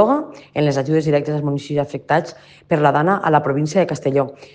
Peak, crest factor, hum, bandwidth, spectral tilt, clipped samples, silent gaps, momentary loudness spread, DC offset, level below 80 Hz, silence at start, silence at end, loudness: 0 dBFS; 18 dB; none; 9.2 kHz; -7 dB/octave; under 0.1%; none; 7 LU; under 0.1%; -58 dBFS; 0 s; 0.1 s; -18 LUFS